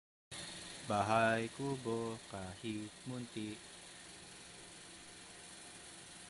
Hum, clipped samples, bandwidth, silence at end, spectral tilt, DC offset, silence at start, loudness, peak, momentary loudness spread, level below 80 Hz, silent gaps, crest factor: none; under 0.1%; 11.5 kHz; 0 s; -4.5 dB/octave; under 0.1%; 0.3 s; -40 LUFS; -20 dBFS; 18 LU; -70 dBFS; none; 22 dB